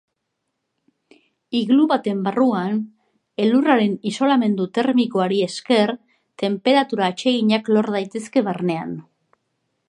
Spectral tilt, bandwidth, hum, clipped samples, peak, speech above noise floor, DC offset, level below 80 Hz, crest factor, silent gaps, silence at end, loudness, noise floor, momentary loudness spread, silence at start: -6 dB/octave; 11 kHz; none; under 0.1%; -2 dBFS; 58 dB; under 0.1%; -72 dBFS; 18 dB; none; 0.9 s; -20 LUFS; -77 dBFS; 9 LU; 1.5 s